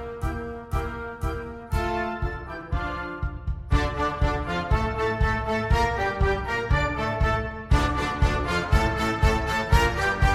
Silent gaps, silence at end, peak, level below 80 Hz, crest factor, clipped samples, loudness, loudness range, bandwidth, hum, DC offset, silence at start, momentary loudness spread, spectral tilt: none; 0 s; -4 dBFS; -28 dBFS; 20 dB; under 0.1%; -26 LUFS; 6 LU; 14.5 kHz; none; under 0.1%; 0 s; 9 LU; -6 dB/octave